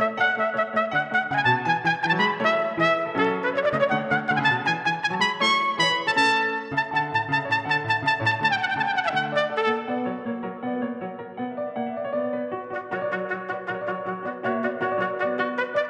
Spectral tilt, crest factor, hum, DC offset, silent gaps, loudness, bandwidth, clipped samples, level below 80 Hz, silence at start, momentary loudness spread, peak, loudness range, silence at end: -4.5 dB/octave; 16 dB; none; under 0.1%; none; -24 LUFS; 10.5 kHz; under 0.1%; -70 dBFS; 0 s; 9 LU; -8 dBFS; 8 LU; 0 s